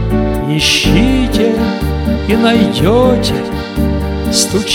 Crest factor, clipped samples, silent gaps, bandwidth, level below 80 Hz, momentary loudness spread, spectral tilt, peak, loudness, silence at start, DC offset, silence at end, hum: 12 dB; under 0.1%; none; 17.5 kHz; -22 dBFS; 6 LU; -4.5 dB/octave; 0 dBFS; -12 LUFS; 0 s; under 0.1%; 0 s; none